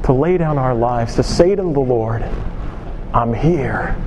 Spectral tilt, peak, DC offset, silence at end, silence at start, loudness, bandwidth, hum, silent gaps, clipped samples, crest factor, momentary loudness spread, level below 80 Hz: -7.5 dB/octave; 0 dBFS; under 0.1%; 0 s; 0 s; -17 LUFS; 11.5 kHz; none; none; under 0.1%; 16 dB; 13 LU; -26 dBFS